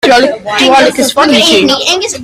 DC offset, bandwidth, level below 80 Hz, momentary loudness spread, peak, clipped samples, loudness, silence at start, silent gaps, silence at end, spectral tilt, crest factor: under 0.1%; 16 kHz; -44 dBFS; 4 LU; 0 dBFS; 0.4%; -7 LUFS; 0.05 s; none; 0 s; -2 dB/octave; 8 dB